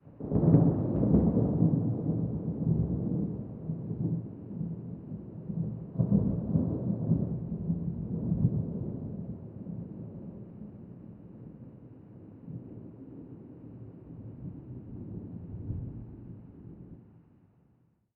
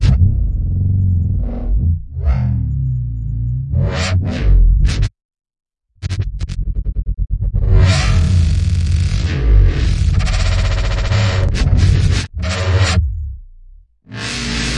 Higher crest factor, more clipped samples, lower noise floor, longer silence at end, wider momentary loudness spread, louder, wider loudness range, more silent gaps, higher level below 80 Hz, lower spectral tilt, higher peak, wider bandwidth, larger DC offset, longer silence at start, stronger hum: first, 24 dB vs 14 dB; neither; first, -68 dBFS vs -41 dBFS; first, 0.95 s vs 0 s; first, 22 LU vs 9 LU; second, -31 LUFS vs -17 LUFS; first, 17 LU vs 4 LU; second, none vs 5.25-5.29 s; second, -48 dBFS vs -18 dBFS; first, -14.5 dB/octave vs -5.5 dB/octave; second, -10 dBFS vs 0 dBFS; second, 1.9 kHz vs 10.5 kHz; neither; about the same, 0.05 s vs 0 s; neither